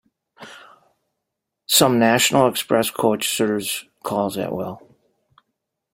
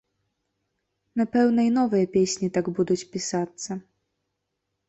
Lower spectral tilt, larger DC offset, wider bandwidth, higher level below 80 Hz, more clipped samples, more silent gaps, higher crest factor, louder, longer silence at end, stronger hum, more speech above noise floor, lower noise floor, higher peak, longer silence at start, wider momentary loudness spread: second, -3 dB/octave vs -5.5 dB/octave; neither; first, 16.5 kHz vs 8.2 kHz; about the same, -60 dBFS vs -64 dBFS; neither; neither; about the same, 20 dB vs 16 dB; first, -19 LUFS vs -24 LUFS; about the same, 1.15 s vs 1.1 s; neither; first, 61 dB vs 57 dB; about the same, -80 dBFS vs -80 dBFS; first, -2 dBFS vs -10 dBFS; second, 0.4 s vs 1.15 s; first, 15 LU vs 12 LU